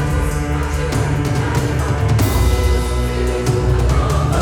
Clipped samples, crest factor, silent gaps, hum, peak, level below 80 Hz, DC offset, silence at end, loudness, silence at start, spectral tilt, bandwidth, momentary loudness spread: under 0.1%; 12 dB; none; none; -4 dBFS; -20 dBFS; under 0.1%; 0 s; -17 LUFS; 0 s; -6 dB/octave; 19.5 kHz; 4 LU